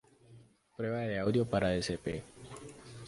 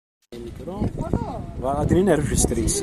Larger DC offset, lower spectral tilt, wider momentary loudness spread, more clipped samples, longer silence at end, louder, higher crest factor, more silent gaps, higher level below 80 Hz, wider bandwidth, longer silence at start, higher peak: neither; about the same, -6 dB/octave vs -5.5 dB/octave; about the same, 19 LU vs 18 LU; neither; about the same, 0 s vs 0 s; second, -34 LUFS vs -22 LUFS; about the same, 20 dB vs 18 dB; neither; second, -56 dBFS vs -32 dBFS; second, 11.5 kHz vs 14.5 kHz; about the same, 0.3 s vs 0.3 s; second, -16 dBFS vs -4 dBFS